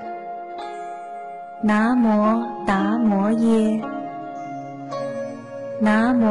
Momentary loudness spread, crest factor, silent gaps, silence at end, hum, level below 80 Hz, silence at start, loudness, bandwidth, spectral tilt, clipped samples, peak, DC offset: 15 LU; 12 dB; none; 0 s; none; -54 dBFS; 0 s; -21 LUFS; 11 kHz; -7.5 dB/octave; under 0.1%; -10 dBFS; 0.2%